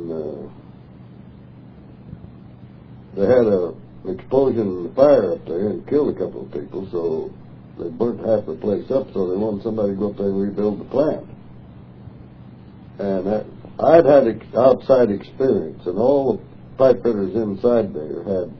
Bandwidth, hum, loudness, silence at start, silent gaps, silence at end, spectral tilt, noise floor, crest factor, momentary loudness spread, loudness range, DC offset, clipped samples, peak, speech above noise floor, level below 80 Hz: 5.4 kHz; none; -19 LUFS; 0 s; none; 0 s; -10 dB/octave; -42 dBFS; 20 dB; 17 LU; 8 LU; under 0.1%; under 0.1%; 0 dBFS; 23 dB; -50 dBFS